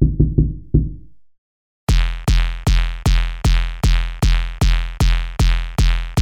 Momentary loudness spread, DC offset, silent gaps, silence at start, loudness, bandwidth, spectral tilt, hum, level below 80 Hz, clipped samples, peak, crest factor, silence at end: 2 LU; under 0.1%; 1.38-1.87 s; 0 s; -19 LUFS; 13 kHz; -5.5 dB/octave; none; -18 dBFS; under 0.1%; 0 dBFS; 16 dB; 0 s